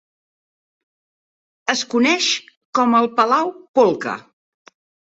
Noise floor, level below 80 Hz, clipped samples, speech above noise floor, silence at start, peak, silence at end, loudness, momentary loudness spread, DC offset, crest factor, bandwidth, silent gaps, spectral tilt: under -90 dBFS; -68 dBFS; under 0.1%; over 73 dB; 1.65 s; -2 dBFS; 0.95 s; -18 LUFS; 10 LU; under 0.1%; 18 dB; 8 kHz; 2.57-2.73 s, 3.69-3.74 s; -2.5 dB/octave